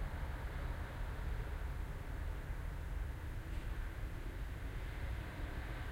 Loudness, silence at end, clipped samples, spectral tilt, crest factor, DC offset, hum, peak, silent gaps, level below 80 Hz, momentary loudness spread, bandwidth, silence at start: -46 LUFS; 0 s; under 0.1%; -6 dB/octave; 12 dB; under 0.1%; none; -32 dBFS; none; -44 dBFS; 2 LU; 16 kHz; 0 s